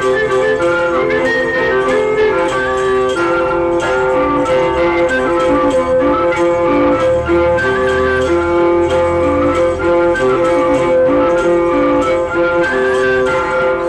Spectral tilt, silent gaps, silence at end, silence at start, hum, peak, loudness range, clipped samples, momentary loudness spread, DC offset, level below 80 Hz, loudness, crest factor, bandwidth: -6 dB/octave; none; 0 s; 0 s; none; -4 dBFS; 1 LU; under 0.1%; 2 LU; under 0.1%; -34 dBFS; -13 LUFS; 8 dB; 10 kHz